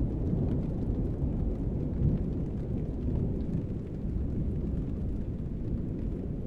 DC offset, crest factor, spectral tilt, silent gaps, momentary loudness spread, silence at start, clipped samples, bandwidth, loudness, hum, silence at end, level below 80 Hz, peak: under 0.1%; 16 dB; -11.5 dB/octave; none; 5 LU; 0 s; under 0.1%; 4.5 kHz; -33 LUFS; none; 0 s; -36 dBFS; -16 dBFS